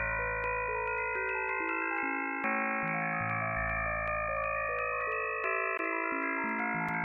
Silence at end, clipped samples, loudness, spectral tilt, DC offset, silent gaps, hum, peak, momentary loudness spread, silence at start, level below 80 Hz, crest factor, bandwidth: 0 s; under 0.1%; -32 LUFS; -8.5 dB/octave; under 0.1%; none; none; -18 dBFS; 1 LU; 0 s; -52 dBFS; 16 dB; 7.8 kHz